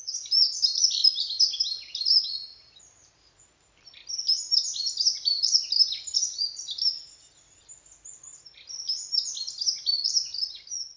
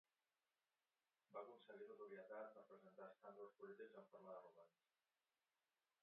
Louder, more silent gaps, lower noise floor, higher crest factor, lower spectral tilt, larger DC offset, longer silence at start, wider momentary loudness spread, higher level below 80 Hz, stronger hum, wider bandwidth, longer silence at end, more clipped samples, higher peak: first, -23 LUFS vs -61 LUFS; neither; second, -60 dBFS vs under -90 dBFS; about the same, 22 dB vs 22 dB; second, 4.5 dB/octave vs -4 dB/octave; neither; second, 0 s vs 1.3 s; first, 16 LU vs 6 LU; first, -72 dBFS vs under -90 dBFS; neither; first, 7.6 kHz vs 4 kHz; second, 0.05 s vs 1.35 s; neither; first, -8 dBFS vs -42 dBFS